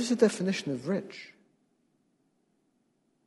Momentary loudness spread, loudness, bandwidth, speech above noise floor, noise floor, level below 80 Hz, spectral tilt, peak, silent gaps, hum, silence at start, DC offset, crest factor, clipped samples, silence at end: 21 LU; -29 LUFS; 11.5 kHz; 44 dB; -73 dBFS; -80 dBFS; -5 dB/octave; -8 dBFS; none; none; 0 s; under 0.1%; 24 dB; under 0.1%; 2 s